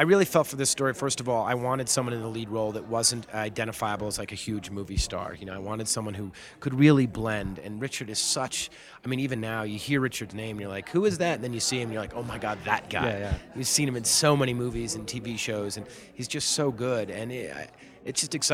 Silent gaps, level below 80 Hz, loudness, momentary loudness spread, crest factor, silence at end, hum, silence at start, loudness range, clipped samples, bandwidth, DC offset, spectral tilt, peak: none; -48 dBFS; -28 LUFS; 12 LU; 22 dB; 0 s; none; 0 s; 4 LU; under 0.1%; 16.5 kHz; under 0.1%; -4 dB/octave; -6 dBFS